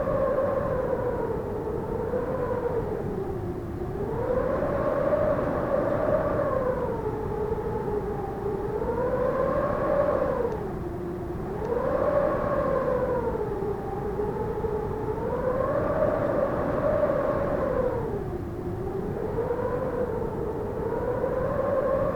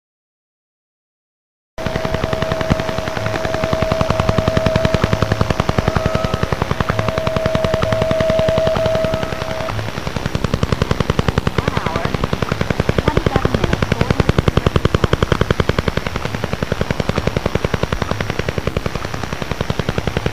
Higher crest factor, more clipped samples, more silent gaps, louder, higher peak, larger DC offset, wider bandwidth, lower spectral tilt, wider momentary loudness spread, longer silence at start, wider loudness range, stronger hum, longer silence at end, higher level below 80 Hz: about the same, 14 dB vs 18 dB; neither; neither; second, -28 LUFS vs -18 LUFS; second, -12 dBFS vs 0 dBFS; second, under 0.1% vs 3%; first, 19.5 kHz vs 16 kHz; first, -9 dB/octave vs -6 dB/octave; about the same, 7 LU vs 6 LU; second, 0 s vs 1.75 s; about the same, 3 LU vs 4 LU; neither; about the same, 0 s vs 0 s; second, -40 dBFS vs -28 dBFS